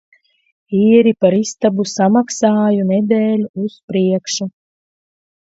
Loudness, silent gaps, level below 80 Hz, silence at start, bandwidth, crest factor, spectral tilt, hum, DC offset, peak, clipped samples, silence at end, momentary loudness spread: -15 LUFS; 3.49-3.54 s, 3.83-3.88 s; -60 dBFS; 0.7 s; 8 kHz; 16 dB; -6 dB/octave; none; under 0.1%; 0 dBFS; under 0.1%; 0.95 s; 11 LU